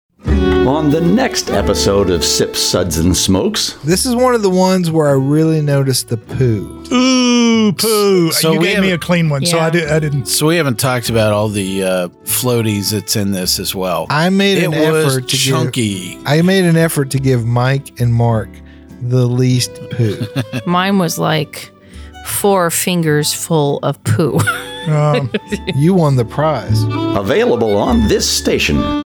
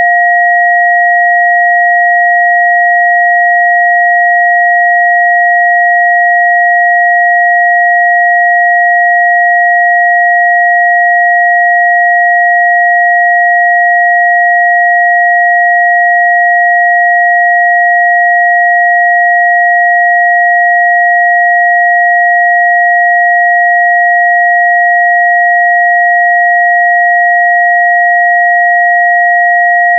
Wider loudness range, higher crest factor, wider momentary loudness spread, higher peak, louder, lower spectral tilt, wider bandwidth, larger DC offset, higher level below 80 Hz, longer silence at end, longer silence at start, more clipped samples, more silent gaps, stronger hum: first, 3 LU vs 0 LU; about the same, 10 dB vs 6 dB; first, 6 LU vs 0 LU; about the same, -2 dBFS vs 0 dBFS; second, -14 LUFS vs -6 LUFS; about the same, -5 dB/octave vs -5.5 dB/octave; first, over 20 kHz vs 2.1 kHz; neither; first, -32 dBFS vs under -90 dBFS; about the same, 0.05 s vs 0 s; first, 0.25 s vs 0 s; neither; neither; neither